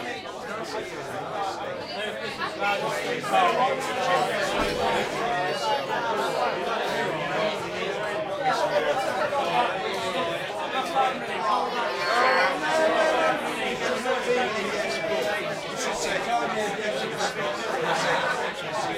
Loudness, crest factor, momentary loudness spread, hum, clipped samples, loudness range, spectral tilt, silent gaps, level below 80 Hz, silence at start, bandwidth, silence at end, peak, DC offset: -26 LUFS; 18 dB; 8 LU; none; under 0.1%; 3 LU; -3 dB/octave; none; -58 dBFS; 0 s; 16 kHz; 0 s; -10 dBFS; under 0.1%